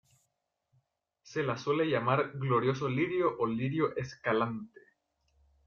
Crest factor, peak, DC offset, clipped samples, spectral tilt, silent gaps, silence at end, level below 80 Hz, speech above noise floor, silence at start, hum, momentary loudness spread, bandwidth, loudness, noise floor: 20 dB; -14 dBFS; under 0.1%; under 0.1%; -7 dB/octave; none; 1 s; -68 dBFS; 51 dB; 1.25 s; none; 7 LU; 7.2 kHz; -31 LUFS; -82 dBFS